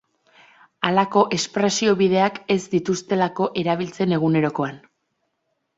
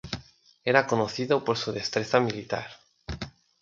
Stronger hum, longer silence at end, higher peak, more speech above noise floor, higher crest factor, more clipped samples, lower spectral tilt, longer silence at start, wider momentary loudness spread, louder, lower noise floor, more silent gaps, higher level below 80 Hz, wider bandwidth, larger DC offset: neither; first, 1 s vs 0.35 s; about the same, -2 dBFS vs -4 dBFS; first, 53 dB vs 26 dB; about the same, 20 dB vs 24 dB; neither; about the same, -5 dB/octave vs -5 dB/octave; first, 0.8 s vs 0.05 s; second, 6 LU vs 17 LU; first, -21 LUFS vs -26 LUFS; first, -74 dBFS vs -52 dBFS; neither; second, -62 dBFS vs -52 dBFS; about the same, 8 kHz vs 7.8 kHz; neither